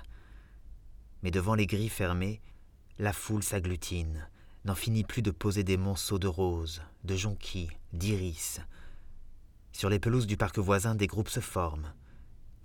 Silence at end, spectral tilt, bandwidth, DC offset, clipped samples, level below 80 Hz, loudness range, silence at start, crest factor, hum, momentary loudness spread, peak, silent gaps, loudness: 0 s; -5.5 dB/octave; 19 kHz; under 0.1%; under 0.1%; -48 dBFS; 3 LU; 0 s; 20 dB; none; 12 LU; -14 dBFS; none; -32 LUFS